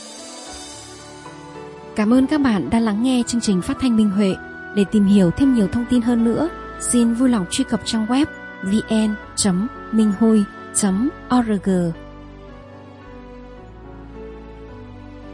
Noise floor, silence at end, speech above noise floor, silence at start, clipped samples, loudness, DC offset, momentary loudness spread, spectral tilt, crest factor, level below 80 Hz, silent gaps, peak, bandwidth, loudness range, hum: -40 dBFS; 0 s; 22 dB; 0 s; under 0.1%; -19 LUFS; under 0.1%; 23 LU; -5 dB/octave; 16 dB; -44 dBFS; none; -4 dBFS; 11.5 kHz; 7 LU; none